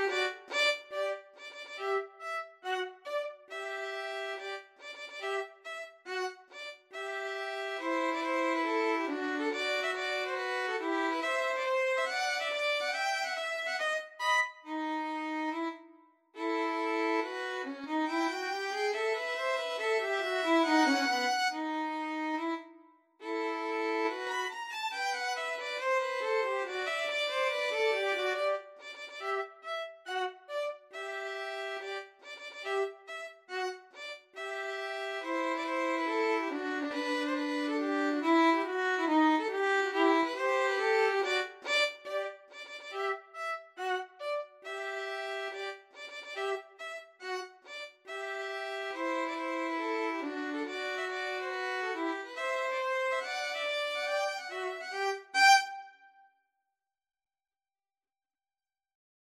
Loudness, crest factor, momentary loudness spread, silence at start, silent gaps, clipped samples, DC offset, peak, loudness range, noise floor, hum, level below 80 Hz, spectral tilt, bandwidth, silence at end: -33 LUFS; 22 dB; 13 LU; 0 s; none; under 0.1%; under 0.1%; -12 dBFS; 9 LU; under -90 dBFS; none; under -90 dBFS; -0.5 dB/octave; 15 kHz; 3.15 s